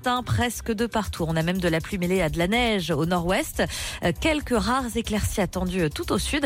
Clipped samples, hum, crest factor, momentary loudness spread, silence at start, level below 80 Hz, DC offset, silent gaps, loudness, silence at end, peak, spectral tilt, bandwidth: under 0.1%; none; 12 dB; 4 LU; 0 s; -38 dBFS; under 0.1%; none; -25 LUFS; 0 s; -12 dBFS; -5 dB/octave; 16.5 kHz